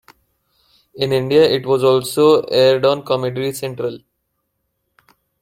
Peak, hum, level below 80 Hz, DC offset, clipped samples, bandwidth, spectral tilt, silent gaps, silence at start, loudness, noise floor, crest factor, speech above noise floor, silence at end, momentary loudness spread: -2 dBFS; none; -58 dBFS; under 0.1%; under 0.1%; 16.5 kHz; -5.5 dB/octave; none; 0.95 s; -16 LUFS; -72 dBFS; 16 dB; 56 dB; 1.45 s; 11 LU